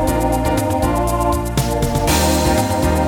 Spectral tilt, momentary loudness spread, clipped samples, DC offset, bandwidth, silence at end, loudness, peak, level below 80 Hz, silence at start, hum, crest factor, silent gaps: -5 dB/octave; 4 LU; under 0.1%; under 0.1%; 20 kHz; 0 s; -17 LUFS; -2 dBFS; -24 dBFS; 0 s; none; 14 dB; none